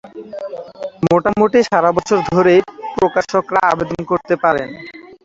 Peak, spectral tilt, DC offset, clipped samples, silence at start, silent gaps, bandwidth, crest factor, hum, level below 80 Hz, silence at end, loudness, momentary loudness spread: -2 dBFS; -6 dB/octave; under 0.1%; under 0.1%; 0.05 s; none; 7.8 kHz; 14 dB; none; -50 dBFS; 0.1 s; -15 LUFS; 16 LU